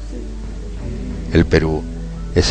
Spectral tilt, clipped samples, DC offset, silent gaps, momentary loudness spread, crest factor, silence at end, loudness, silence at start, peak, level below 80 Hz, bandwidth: -6 dB/octave; under 0.1%; under 0.1%; none; 16 LU; 18 dB; 0 s; -20 LUFS; 0 s; 0 dBFS; -26 dBFS; 9.6 kHz